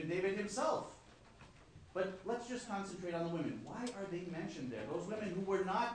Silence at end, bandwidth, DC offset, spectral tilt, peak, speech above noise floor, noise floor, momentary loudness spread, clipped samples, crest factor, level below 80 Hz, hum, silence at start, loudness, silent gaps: 0 s; 10 kHz; under 0.1%; -5.5 dB/octave; -24 dBFS; 20 dB; -60 dBFS; 19 LU; under 0.1%; 16 dB; -68 dBFS; none; 0 s; -41 LUFS; none